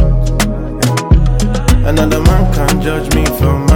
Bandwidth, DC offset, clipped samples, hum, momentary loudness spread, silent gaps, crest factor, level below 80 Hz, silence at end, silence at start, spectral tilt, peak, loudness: 17.5 kHz; under 0.1%; under 0.1%; none; 4 LU; none; 10 dB; -14 dBFS; 0 s; 0 s; -6 dB/octave; 0 dBFS; -13 LUFS